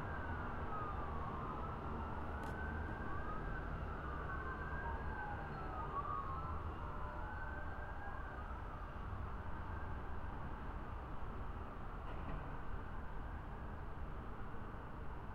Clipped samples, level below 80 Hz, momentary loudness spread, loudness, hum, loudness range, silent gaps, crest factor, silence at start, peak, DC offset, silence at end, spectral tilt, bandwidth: under 0.1%; -50 dBFS; 6 LU; -47 LUFS; none; 4 LU; none; 14 dB; 0 s; -30 dBFS; under 0.1%; 0 s; -8 dB/octave; 7.8 kHz